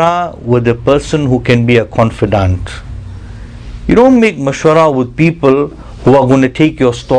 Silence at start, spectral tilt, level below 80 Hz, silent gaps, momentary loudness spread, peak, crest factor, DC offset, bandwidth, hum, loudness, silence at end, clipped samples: 0 s; -7 dB/octave; -30 dBFS; none; 19 LU; 0 dBFS; 10 dB; under 0.1%; 10 kHz; none; -10 LUFS; 0 s; 1%